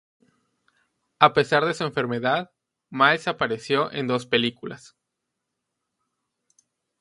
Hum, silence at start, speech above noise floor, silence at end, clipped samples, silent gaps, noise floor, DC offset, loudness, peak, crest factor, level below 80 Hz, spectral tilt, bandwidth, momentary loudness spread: none; 1.2 s; 59 dB; 2.25 s; under 0.1%; none; -81 dBFS; under 0.1%; -22 LUFS; 0 dBFS; 26 dB; -66 dBFS; -5 dB/octave; 11.5 kHz; 19 LU